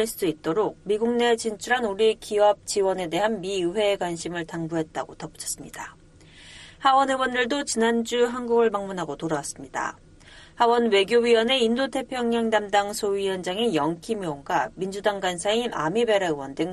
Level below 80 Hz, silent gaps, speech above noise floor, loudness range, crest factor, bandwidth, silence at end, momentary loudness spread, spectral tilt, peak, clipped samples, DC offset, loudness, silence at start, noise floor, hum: -56 dBFS; none; 25 dB; 5 LU; 18 dB; 13 kHz; 0 s; 11 LU; -3.5 dB/octave; -6 dBFS; under 0.1%; under 0.1%; -24 LUFS; 0 s; -49 dBFS; none